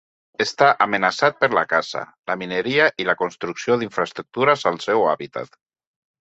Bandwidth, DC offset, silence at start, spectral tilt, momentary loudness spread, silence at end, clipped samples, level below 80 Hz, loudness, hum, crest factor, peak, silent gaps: 8.2 kHz; under 0.1%; 0.4 s; -4 dB/octave; 12 LU; 0.75 s; under 0.1%; -66 dBFS; -20 LUFS; none; 20 dB; 0 dBFS; 2.19-2.23 s